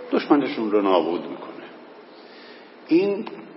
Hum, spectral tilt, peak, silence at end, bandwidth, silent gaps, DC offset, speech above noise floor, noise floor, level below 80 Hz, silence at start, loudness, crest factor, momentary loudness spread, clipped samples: none; -9.5 dB/octave; -4 dBFS; 0 s; 5.8 kHz; none; under 0.1%; 23 dB; -45 dBFS; -82 dBFS; 0 s; -22 LUFS; 20 dB; 24 LU; under 0.1%